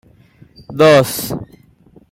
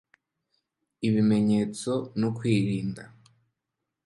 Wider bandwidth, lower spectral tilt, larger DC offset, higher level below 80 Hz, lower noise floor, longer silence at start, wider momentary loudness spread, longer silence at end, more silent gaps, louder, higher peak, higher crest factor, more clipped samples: first, 16.5 kHz vs 11.5 kHz; second, -5 dB/octave vs -7 dB/octave; neither; first, -50 dBFS vs -62 dBFS; second, -48 dBFS vs -85 dBFS; second, 0.7 s vs 1 s; first, 18 LU vs 9 LU; second, 0.65 s vs 1 s; neither; first, -13 LUFS vs -26 LUFS; first, 0 dBFS vs -12 dBFS; about the same, 16 dB vs 16 dB; neither